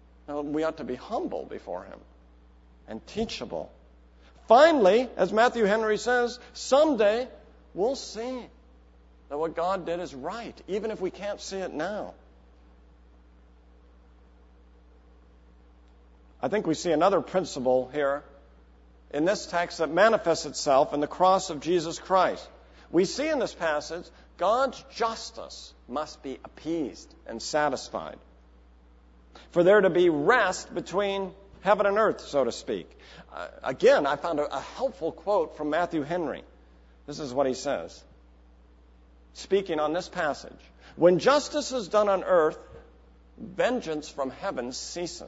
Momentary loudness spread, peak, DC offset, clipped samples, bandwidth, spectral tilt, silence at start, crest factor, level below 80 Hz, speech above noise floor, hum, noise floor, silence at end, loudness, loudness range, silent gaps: 17 LU; -6 dBFS; under 0.1%; under 0.1%; 8 kHz; -4.5 dB/octave; 0.3 s; 22 dB; -56 dBFS; 29 dB; none; -55 dBFS; 0 s; -26 LUFS; 11 LU; none